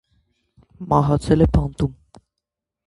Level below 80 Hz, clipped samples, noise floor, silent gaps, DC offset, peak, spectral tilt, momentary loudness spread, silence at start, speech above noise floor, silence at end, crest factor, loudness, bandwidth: -32 dBFS; under 0.1%; -83 dBFS; none; under 0.1%; -2 dBFS; -8.5 dB/octave; 10 LU; 0.8 s; 65 dB; 0.95 s; 20 dB; -19 LUFS; 11.5 kHz